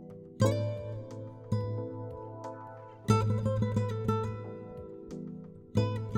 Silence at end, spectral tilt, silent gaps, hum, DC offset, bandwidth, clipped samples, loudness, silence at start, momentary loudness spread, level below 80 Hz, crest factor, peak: 0 s; -7.5 dB/octave; none; none; under 0.1%; 11 kHz; under 0.1%; -33 LUFS; 0 s; 16 LU; -54 dBFS; 20 dB; -12 dBFS